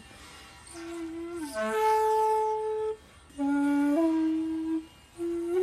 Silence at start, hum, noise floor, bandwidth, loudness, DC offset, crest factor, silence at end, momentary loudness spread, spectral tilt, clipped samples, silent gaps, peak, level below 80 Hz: 0 s; none; -49 dBFS; 14 kHz; -29 LUFS; under 0.1%; 12 dB; 0 s; 22 LU; -5 dB/octave; under 0.1%; none; -16 dBFS; -60 dBFS